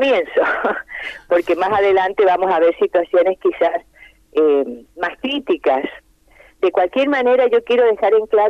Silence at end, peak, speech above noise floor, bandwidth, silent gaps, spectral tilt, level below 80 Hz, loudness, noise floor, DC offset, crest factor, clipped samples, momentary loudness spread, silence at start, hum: 0 s; -4 dBFS; 33 dB; 7.4 kHz; none; -5.5 dB/octave; -54 dBFS; -17 LUFS; -49 dBFS; under 0.1%; 12 dB; under 0.1%; 10 LU; 0 s; none